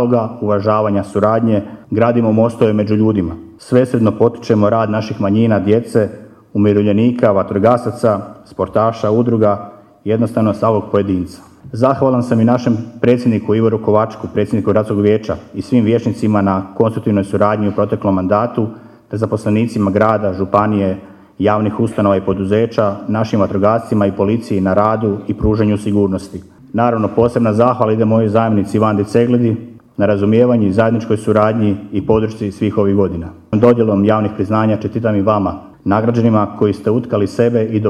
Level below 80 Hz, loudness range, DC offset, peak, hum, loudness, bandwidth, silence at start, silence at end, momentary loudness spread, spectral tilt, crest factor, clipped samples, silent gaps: -42 dBFS; 2 LU; under 0.1%; 0 dBFS; none; -15 LUFS; 11 kHz; 0 s; 0 s; 7 LU; -8.5 dB/octave; 14 dB; under 0.1%; none